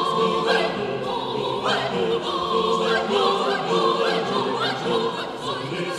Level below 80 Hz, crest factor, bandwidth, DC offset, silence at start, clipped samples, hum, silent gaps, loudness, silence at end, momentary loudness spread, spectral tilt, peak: -58 dBFS; 16 dB; 12.5 kHz; under 0.1%; 0 s; under 0.1%; none; none; -22 LUFS; 0 s; 6 LU; -4.5 dB/octave; -8 dBFS